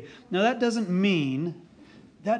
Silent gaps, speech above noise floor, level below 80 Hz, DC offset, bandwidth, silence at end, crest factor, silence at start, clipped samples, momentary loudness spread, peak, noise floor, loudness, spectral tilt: none; 26 dB; -70 dBFS; under 0.1%; 9.8 kHz; 0 s; 16 dB; 0 s; under 0.1%; 11 LU; -12 dBFS; -52 dBFS; -26 LUFS; -6 dB/octave